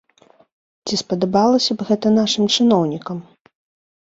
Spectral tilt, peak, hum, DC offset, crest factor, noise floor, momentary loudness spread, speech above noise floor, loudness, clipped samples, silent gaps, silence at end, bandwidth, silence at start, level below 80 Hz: -5 dB/octave; -2 dBFS; none; under 0.1%; 16 dB; -54 dBFS; 14 LU; 37 dB; -17 LUFS; under 0.1%; none; 0.95 s; 7.8 kHz; 0.85 s; -60 dBFS